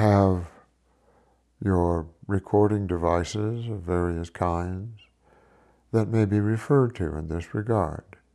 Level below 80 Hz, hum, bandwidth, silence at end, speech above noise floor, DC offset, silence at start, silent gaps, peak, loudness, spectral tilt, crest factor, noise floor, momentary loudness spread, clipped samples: -48 dBFS; none; 11.5 kHz; 0.35 s; 39 dB; under 0.1%; 0 s; none; -8 dBFS; -26 LUFS; -8 dB/octave; 18 dB; -64 dBFS; 10 LU; under 0.1%